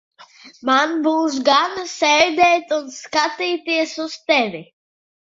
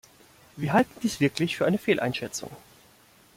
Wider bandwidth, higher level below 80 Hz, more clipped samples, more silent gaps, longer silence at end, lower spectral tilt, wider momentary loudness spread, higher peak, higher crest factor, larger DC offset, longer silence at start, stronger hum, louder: second, 7.8 kHz vs 16.5 kHz; about the same, -62 dBFS vs -62 dBFS; neither; neither; about the same, 0.7 s vs 0.8 s; second, -2 dB/octave vs -5 dB/octave; about the same, 10 LU vs 11 LU; first, -2 dBFS vs -8 dBFS; about the same, 18 dB vs 20 dB; neither; second, 0.2 s vs 0.55 s; neither; first, -18 LUFS vs -26 LUFS